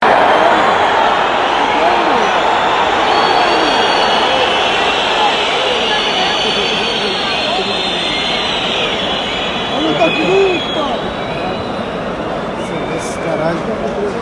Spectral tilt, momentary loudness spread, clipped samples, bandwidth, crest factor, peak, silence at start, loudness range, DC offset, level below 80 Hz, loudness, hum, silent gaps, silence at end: -3.5 dB/octave; 8 LU; under 0.1%; 11.5 kHz; 14 dB; 0 dBFS; 0 s; 5 LU; under 0.1%; -42 dBFS; -13 LUFS; none; none; 0 s